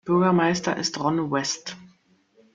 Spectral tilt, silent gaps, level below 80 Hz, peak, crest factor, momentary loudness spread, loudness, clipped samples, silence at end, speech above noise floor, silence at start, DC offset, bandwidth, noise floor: -4.5 dB/octave; none; -64 dBFS; -8 dBFS; 16 dB; 14 LU; -23 LUFS; under 0.1%; 0.7 s; 38 dB; 0.05 s; under 0.1%; 7.6 kHz; -61 dBFS